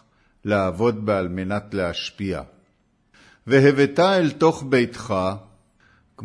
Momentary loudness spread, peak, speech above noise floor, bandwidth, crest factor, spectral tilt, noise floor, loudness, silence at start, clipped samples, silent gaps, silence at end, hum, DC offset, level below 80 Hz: 12 LU; -4 dBFS; 44 dB; 10.5 kHz; 20 dB; -6.5 dB/octave; -64 dBFS; -21 LUFS; 0.45 s; under 0.1%; none; 0 s; none; under 0.1%; -54 dBFS